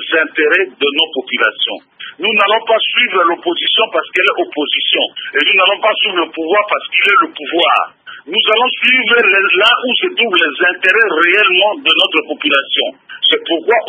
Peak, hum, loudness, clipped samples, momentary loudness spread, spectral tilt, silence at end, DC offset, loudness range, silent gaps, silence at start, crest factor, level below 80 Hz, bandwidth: 0 dBFS; none; -11 LUFS; under 0.1%; 7 LU; -3 dB/octave; 0 s; under 0.1%; 3 LU; none; 0 s; 14 dB; -66 dBFS; 11 kHz